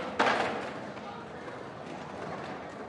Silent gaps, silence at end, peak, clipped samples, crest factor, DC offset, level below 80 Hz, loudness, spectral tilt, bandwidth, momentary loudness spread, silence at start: none; 0 s; -10 dBFS; under 0.1%; 24 dB; under 0.1%; -70 dBFS; -35 LUFS; -4.5 dB/octave; 11.5 kHz; 15 LU; 0 s